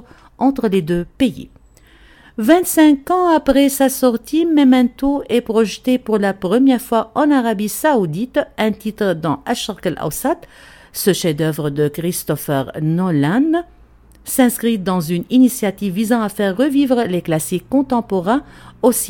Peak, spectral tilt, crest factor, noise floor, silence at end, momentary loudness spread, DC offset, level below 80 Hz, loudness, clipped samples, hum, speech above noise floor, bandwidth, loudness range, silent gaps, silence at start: 0 dBFS; -5.5 dB/octave; 16 dB; -47 dBFS; 0 s; 8 LU; under 0.1%; -46 dBFS; -16 LUFS; under 0.1%; none; 31 dB; 17.5 kHz; 6 LU; none; 0.4 s